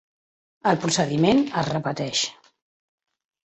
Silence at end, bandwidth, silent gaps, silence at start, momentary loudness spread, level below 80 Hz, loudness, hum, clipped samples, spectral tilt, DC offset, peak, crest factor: 1.15 s; 8.4 kHz; none; 0.65 s; 7 LU; -58 dBFS; -23 LUFS; none; under 0.1%; -4.5 dB/octave; under 0.1%; -6 dBFS; 18 dB